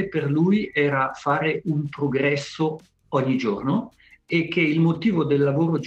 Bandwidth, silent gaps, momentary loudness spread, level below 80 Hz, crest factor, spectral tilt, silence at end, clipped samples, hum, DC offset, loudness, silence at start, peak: 8.4 kHz; none; 7 LU; -60 dBFS; 14 dB; -7.5 dB/octave; 0 s; under 0.1%; none; under 0.1%; -22 LUFS; 0 s; -8 dBFS